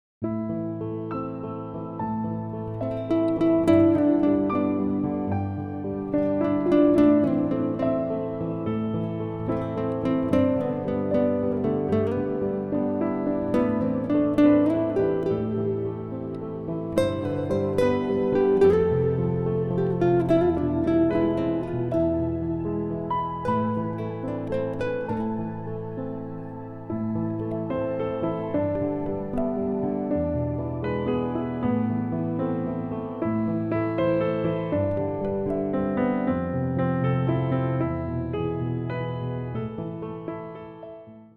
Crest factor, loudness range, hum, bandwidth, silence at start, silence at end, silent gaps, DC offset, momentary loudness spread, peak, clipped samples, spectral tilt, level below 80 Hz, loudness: 16 dB; 6 LU; none; 10 kHz; 0.2 s; 0.1 s; none; under 0.1%; 11 LU; -8 dBFS; under 0.1%; -9.5 dB/octave; -48 dBFS; -25 LUFS